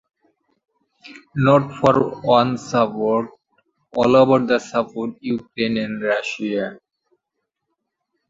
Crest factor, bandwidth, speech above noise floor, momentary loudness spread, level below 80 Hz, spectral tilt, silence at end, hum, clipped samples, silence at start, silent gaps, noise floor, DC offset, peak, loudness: 18 dB; 7.8 kHz; 60 dB; 12 LU; -56 dBFS; -6.5 dB/octave; 1.55 s; none; under 0.1%; 1.05 s; none; -79 dBFS; under 0.1%; -2 dBFS; -19 LUFS